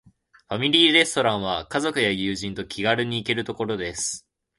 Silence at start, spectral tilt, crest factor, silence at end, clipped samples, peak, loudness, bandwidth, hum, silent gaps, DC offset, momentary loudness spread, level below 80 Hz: 0.5 s; -3 dB/octave; 22 dB; 0.4 s; under 0.1%; -2 dBFS; -22 LUFS; 11.5 kHz; none; none; under 0.1%; 13 LU; -54 dBFS